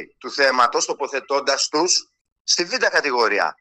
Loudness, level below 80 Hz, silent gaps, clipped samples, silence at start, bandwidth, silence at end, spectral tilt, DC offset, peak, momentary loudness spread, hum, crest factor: -19 LUFS; -68 dBFS; 2.21-2.25 s, 2.32-2.45 s; under 0.1%; 0 s; 11.5 kHz; 0.1 s; 0 dB/octave; under 0.1%; -4 dBFS; 6 LU; none; 16 dB